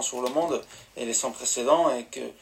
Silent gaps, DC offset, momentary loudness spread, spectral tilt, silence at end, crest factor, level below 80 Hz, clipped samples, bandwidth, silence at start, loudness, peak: none; under 0.1%; 14 LU; -2 dB/octave; 0.1 s; 20 dB; -66 dBFS; under 0.1%; 16 kHz; 0 s; -26 LUFS; -8 dBFS